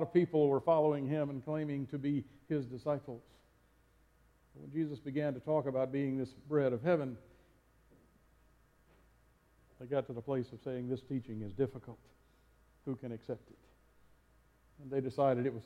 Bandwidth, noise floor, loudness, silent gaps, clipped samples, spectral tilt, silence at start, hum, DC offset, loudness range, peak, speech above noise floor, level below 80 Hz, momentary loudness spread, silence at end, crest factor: 10.5 kHz; -69 dBFS; -36 LUFS; none; under 0.1%; -9.5 dB/octave; 0 s; none; under 0.1%; 9 LU; -18 dBFS; 33 dB; -70 dBFS; 15 LU; 0.05 s; 20 dB